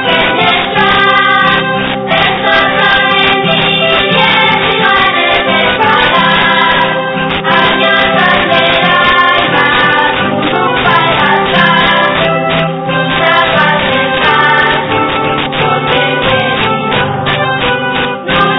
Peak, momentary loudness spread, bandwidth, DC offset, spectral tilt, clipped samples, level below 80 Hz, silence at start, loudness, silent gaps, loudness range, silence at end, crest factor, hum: 0 dBFS; 5 LU; 5.4 kHz; under 0.1%; -6.5 dB/octave; 0.5%; -36 dBFS; 0 s; -8 LUFS; none; 2 LU; 0 s; 10 dB; none